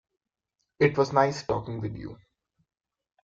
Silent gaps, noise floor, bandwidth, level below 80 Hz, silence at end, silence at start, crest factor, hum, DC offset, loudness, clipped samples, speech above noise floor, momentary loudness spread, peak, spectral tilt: none; -82 dBFS; 7.6 kHz; -58 dBFS; 1.1 s; 0.8 s; 22 dB; none; under 0.1%; -26 LUFS; under 0.1%; 56 dB; 15 LU; -6 dBFS; -6.5 dB/octave